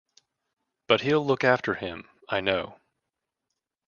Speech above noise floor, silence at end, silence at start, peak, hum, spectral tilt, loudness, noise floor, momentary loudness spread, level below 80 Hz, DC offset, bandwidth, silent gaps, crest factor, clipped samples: 60 dB; 1.15 s; 0.9 s; -4 dBFS; none; -6 dB/octave; -25 LUFS; -85 dBFS; 14 LU; -62 dBFS; under 0.1%; 7.2 kHz; none; 24 dB; under 0.1%